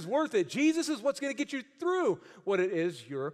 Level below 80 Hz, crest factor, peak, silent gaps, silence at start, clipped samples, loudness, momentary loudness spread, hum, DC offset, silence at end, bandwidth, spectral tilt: -84 dBFS; 14 dB; -16 dBFS; none; 0 s; under 0.1%; -31 LUFS; 7 LU; none; under 0.1%; 0 s; 13.5 kHz; -4.5 dB/octave